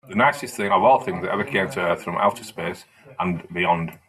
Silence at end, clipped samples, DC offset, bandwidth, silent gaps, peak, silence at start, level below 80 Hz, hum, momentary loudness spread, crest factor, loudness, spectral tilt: 0.15 s; under 0.1%; under 0.1%; 15 kHz; none; -4 dBFS; 0.05 s; -62 dBFS; none; 13 LU; 18 dB; -22 LUFS; -5.5 dB/octave